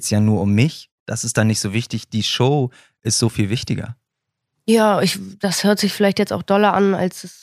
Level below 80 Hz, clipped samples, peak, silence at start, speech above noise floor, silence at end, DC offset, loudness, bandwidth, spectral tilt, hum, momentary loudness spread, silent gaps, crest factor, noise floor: -54 dBFS; under 0.1%; -2 dBFS; 0 s; 61 dB; 0.1 s; under 0.1%; -18 LUFS; 15.5 kHz; -5 dB/octave; none; 10 LU; 0.91-1.06 s; 18 dB; -79 dBFS